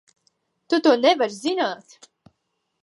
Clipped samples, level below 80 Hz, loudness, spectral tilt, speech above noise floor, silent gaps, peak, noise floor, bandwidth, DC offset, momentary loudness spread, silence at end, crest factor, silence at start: under 0.1%; -80 dBFS; -20 LUFS; -3.5 dB/octave; 55 dB; none; -4 dBFS; -75 dBFS; 11.5 kHz; under 0.1%; 10 LU; 1.1 s; 20 dB; 0.7 s